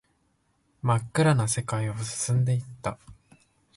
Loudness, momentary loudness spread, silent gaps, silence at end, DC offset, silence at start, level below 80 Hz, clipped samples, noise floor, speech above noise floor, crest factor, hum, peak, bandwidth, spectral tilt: -27 LUFS; 13 LU; none; 0.65 s; under 0.1%; 0.85 s; -56 dBFS; under 0.1%; -70 dBFS; 44 dB; 18 dB; none; -10 dBFS; 11.5 kHz; -5.5 dB/octave